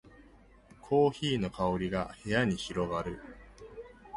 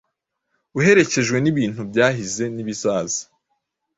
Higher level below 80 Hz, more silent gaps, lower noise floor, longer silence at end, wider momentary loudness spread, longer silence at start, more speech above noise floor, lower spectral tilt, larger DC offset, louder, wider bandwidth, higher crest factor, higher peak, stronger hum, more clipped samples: about the same, -54 dBFS vs -56 dBFS; neither; second, -58 dBFS vs -76 dBFS; second, 0 s vs 0.75 s; first, 22 LU vs 11 LU; about the same, 0.85 s vs 0.75 s; second, 27 dB vs 57 dB; first, -6 dB/octave vs -4.5 dB/octave; neither; second, -31 LUFS vs -19 LUFS; first, 11.5 kHz vs 8 kHz; about the same, 20 dB vs 20 dB; second, -14 dBFS vs -2 dBFS; neither; neither